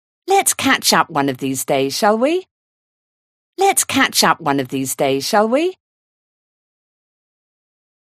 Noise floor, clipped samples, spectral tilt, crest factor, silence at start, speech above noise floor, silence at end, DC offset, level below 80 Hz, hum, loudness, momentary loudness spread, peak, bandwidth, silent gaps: under -90 dBFS; under 0.1%; -2.5 dB/octave; 18 dB; 0.25 s; over 74 dB; 2.3 s; under 0.1%; -62 dBFS; none; -16 LUFS; 7 LU; 0 dBFS; 15.5 kHz; 2.51-3.53 s